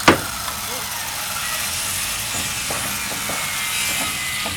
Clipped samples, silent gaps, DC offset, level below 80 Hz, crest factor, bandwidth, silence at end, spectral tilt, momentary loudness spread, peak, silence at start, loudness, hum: under 0.1%; none; under 0.1%; -44 dBFS; 22 dB; 19.5 kHz; 0 s; -1.5 dB/octave; 5 LU; 0 dBFS; 0 s; -21 LUFS; none